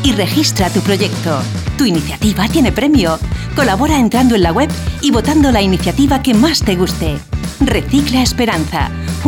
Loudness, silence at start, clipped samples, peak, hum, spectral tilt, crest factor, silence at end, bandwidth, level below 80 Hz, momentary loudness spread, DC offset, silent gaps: -13 LUFS; 0 s; under 0.1%; 0 dBFS; none; -5 dB/octave; 12 dB; 0 s; 18.5 kHz; -24 dBFS; 7 LU; under 0.1%; none